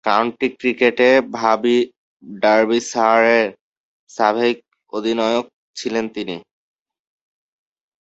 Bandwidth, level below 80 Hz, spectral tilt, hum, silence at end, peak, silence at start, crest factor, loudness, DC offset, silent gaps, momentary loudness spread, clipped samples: 8.2 kHz; -64 dBFS; -4 dB/octave; none; 1.6 s; -2 dBFS; 0.05 s; 18 dB; -17 LUFS; under 0.1%; 1.97-2.20 s, 3.61-4.07 s, 5.53-5.74 s; 15 LU; under 0.1%